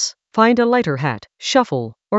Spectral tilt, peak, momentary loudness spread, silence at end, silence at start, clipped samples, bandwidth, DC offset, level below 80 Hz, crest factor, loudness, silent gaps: -4.5 dB/octave; 0 dBFS; 10 LU; 0 s; 0 s; under 0.1%; 8 kHz; under 0.1%; -60 dBFS; 18 dB; -18 LUFS; none